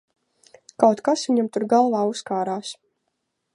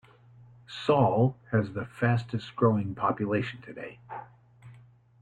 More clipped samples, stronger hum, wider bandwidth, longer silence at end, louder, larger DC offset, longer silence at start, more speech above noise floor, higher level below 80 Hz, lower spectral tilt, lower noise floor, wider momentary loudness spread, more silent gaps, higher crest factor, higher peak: neither; neither; first, 11.5 kHz vs 7.8 kHz; first, 0.8 s vs 0.5 s; first, -21 LUFS vs -28 LUFS; neither; about the same, 0.8 s vs 0.7 s; first, 56 dB vs 28 dB; second, -74 dBFS vs -64 dBFS; second, -5 dB/octave vs -8.5 dB/octave; first, -76 dBFS vs -55 dBFS; second, 12 LU vs 18 LU; neither; about the same, 22 dB vs 18 dB; first, -2 dBFS vs -12 dBFS